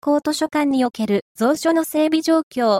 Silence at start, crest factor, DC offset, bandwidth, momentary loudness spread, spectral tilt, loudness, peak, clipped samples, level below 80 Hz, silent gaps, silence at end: 0.05 s; 12 dB; under 0.1%; 16.5 kHz; 3 LU; -4.5 dB/octave; -19 LUFS; -6 dBFS; under 0.1%; -64 dBFS; 1.22-1.35 s, 2.43-2.51 s; 0 s